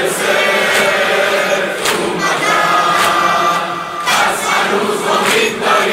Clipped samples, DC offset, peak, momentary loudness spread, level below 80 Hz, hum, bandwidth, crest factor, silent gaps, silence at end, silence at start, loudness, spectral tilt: under 0.1%; under 0.1%; 0 dBFS; 4 LU; -54 dBFS; none; 16.5 kHz; 14 dB; none; 0 s; 0 s; -13 LUFS; -2 dB/octave